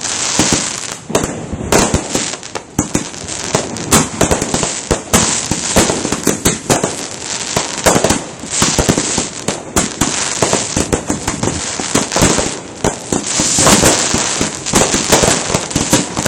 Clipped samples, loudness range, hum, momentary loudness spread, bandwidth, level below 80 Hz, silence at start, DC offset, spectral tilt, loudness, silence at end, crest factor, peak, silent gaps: 0.1%; 4 LU; none; 9 LU; over 20 kHz; -32 dBFS; 0 s; under 0.1%; -3 dB/octave; -14 LUFS; 0 s; 16 dB; 0 dBFS; none